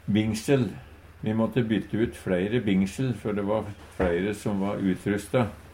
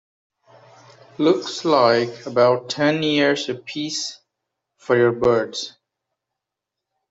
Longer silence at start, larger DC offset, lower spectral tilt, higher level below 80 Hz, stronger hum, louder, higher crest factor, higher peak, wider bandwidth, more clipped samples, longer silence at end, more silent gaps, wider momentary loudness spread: second, 0.05 s vs 1.2 s; neither; first, -7 dB/octave vs -4.5 dB/octave; first, -48 dBFS vs -60 dBFS; neither; second, -27 LUFS vs -20 LUFS; about the same, 16 dB vs 18 dB; second, -10 dBFS vs -4 dBFS; first, 16 kHz vs 8 kHz; neither; second, 0 s vs 1.4 s; neither; second, 5 LU vs 11 LU